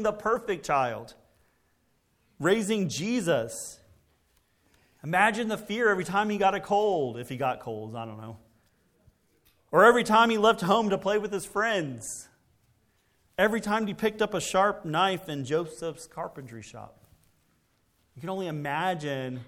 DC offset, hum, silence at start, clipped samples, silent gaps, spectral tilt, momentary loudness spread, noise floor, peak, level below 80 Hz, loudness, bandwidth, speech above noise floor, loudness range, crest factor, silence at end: under 0.1%; none; 0 s; under 0.1%; none; -4.5 dB/octave; 17 LU; -70 dBFS; -6 dBFS; -62 dBFS; -27 LUFS; 17 kHz; 43 dB; 9 LU; 22 dB; 0.05 s